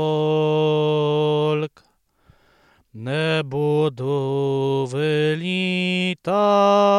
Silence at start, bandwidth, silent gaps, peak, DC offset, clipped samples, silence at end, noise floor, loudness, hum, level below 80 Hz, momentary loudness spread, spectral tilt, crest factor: 0 s; 11 kHz; none; -4 dBFS; under 0.1%; under 0.1%; 0 s; -61 dBFS; -20 LUFS; none; -66 dBFS; 6 LU; -6.5 dB/octave; 16 dB